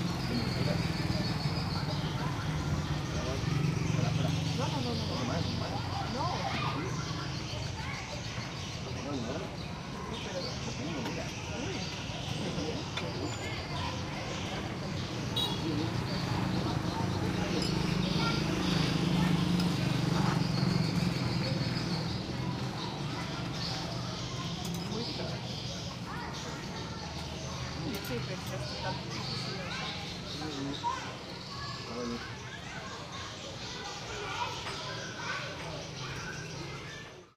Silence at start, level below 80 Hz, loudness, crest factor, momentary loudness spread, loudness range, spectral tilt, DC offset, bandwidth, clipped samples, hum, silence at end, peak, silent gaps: 0 s; -50 dBFS; -34 LUFS; 18 dB; 9 LU; 8 LU; -5 dB/octave; under 0.1%; 15.5 kHz; under 0.1%; none; 0.05 s; -16 dBFS; none